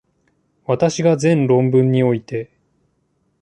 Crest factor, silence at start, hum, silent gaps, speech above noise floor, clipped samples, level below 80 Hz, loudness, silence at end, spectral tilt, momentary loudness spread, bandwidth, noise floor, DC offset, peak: 16 dB; 0.7 s; none; none; 50 dB; under 0.1%; -58 dBFS; -17 LUFS; 0.95 s; -7 dB/octave; 14 LU; 9.6 kHz; -65 dBFS; under 0.1%; -4 dBFS